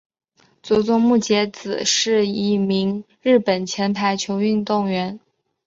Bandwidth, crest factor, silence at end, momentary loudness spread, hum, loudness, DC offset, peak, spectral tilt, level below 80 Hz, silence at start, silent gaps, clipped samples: 7.8 kHz; 14 dB; 0.5 s; 8 LU; none; -19 LUFS; under 0.1%; -6 dBFS; -4.5 dB/octave; -60 dBFS; 0.65 s; none; under 0.1%